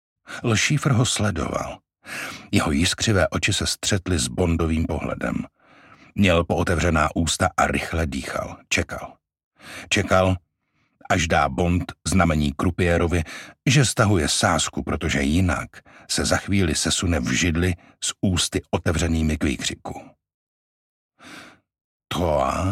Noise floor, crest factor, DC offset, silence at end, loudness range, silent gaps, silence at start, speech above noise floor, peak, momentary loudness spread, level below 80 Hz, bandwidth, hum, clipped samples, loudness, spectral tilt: -70 dBFS; 20 dB; under 0.1%; 0 s; 4 LU; 9.44-9.51 s, 20.34-21.10 s, 21.81-22.00 s; 0.3 s; 48 dB; -4 dBFS; 12 LU; -36 dBFS; 16 kHz; none; under 0.1%; -22 LUFS; -4.5 dB/octave